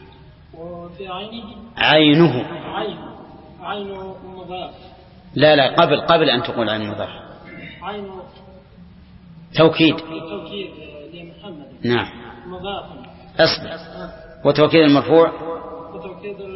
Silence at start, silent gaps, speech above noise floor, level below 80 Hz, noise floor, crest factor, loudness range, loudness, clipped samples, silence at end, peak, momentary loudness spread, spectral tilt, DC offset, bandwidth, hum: 0.55 s; none; 25 dB; -50 dBFS; -44 dBFS; 20 dB; 7 LU; -17 LUFS; under 0.1%; 0 s; 0 dBFS; 24 LU; -9 dB/octave; under 0.1%; 5.8 kHz; none